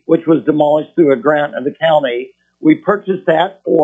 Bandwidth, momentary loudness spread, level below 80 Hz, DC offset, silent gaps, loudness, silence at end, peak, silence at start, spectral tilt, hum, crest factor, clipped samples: 3.8 kHz; 6 LU; -62 dBFS; under 0.1%; none; -14 LUFS; 0 s; 0 dBFS; 0.1 s; -8.5 dB/octave; none; 14 dB; under 0.1%